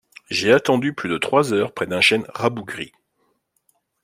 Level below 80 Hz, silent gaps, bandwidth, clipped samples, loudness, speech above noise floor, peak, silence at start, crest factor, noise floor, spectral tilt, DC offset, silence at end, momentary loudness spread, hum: -62 dBFS; none; 16 kHz; under 0.1%; -19 LUFS; 49 dB; -2 dBFS; 0.3 s; 20 dB; -68 dBFS; -4.5 dB/octave; under 0.1%; 1.15 s; 14 LU; none